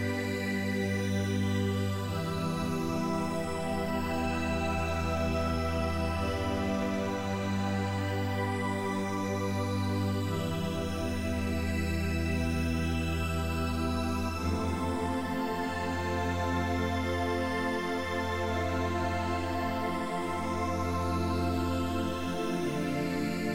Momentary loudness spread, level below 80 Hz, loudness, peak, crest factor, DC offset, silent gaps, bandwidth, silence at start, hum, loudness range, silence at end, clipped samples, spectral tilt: 2 LU; -48 dBFS; -32 LUFS; -18 dBFS; 12 dB; under 0.1%; none; 16 kHz; 0 s; none; 1 LU; 0 s; under 0.1%; -6 dB/octave